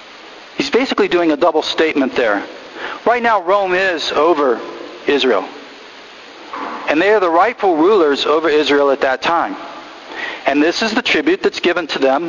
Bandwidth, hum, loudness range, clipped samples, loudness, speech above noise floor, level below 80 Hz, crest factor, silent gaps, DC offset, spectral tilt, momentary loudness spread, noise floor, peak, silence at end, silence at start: 7.4 kHz; none; 3 LU; under 0.1%; -15 LUFS; 22 dB; -54 dBFS; 16 dB; none; under 0.1%; -3.5 dB/octave; 18 LU; -37 dBFS; 0 dBFS; 0 s; 0 s